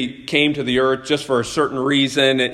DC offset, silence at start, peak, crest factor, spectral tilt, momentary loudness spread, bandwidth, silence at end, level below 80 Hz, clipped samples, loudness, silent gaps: under 0.1%; 0 s; -2 dBFS; 18 dB; -4 dB/octave; 5 LU; 13 kHz; 0 s; -52 dBFS; under 0.1%; -18 LUFS; none